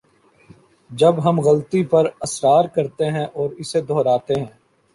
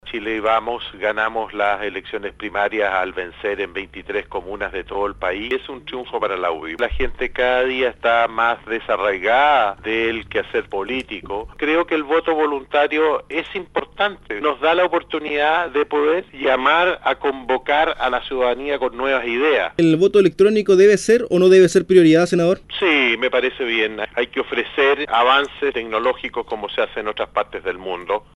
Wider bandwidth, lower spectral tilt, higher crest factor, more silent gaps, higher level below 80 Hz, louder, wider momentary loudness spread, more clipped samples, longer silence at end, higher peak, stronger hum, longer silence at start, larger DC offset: about the same, 11.5 kHz vs 11.5 kHz; about the same, -6 dB/octave vs -5 dB/octave; about the same, 16 dB vs 18 dB; neither; second, -58 dBFS vs -44 dBFS; about the same, -19 LUFS vs -19 LUFS; second, 9 LU vs 12 LU; neither; first, 0.45 s vs 0.15 s; about the same, -2 dBFS vs -2 dBFS; second, none vs 50 Hz at -55 dBFS; first, 0.9 s vs 0.05 s; neither